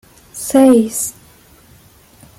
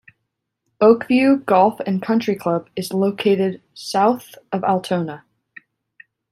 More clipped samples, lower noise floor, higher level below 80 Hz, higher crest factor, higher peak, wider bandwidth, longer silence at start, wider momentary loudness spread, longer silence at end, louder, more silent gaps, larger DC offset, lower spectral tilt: neither; second, -46 dBFS vs -77 dBFS; first, -52 dBFS vs -64 dBFS; about the same, 16 dB vs 18 dB; about the same, 0 dBFS vs -2 dBFS; about the same, 16.5 kHz vs 15 kHz; second, 0.35 s vs 0.8 s; first, 17 LU vs 11 LU; first, 1.3 s vs 1.15 s; first, -13 LUFS vs -19 LUFS; neither; neither; second, -4.5 dB/octave vs -6.5 dB/octave